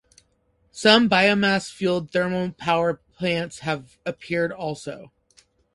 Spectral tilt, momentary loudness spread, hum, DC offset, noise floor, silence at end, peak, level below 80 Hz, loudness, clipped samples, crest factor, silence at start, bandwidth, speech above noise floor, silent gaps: -4.5 dB/octave; 16 LU; none; under 0.1%; -66 dBFS; 0.7 s; -2 dBFS; -58 dBFS; -22 LUFS; under 0.1%; 22 dB; 0.75 s; 11.5 kHz; 44 dB; none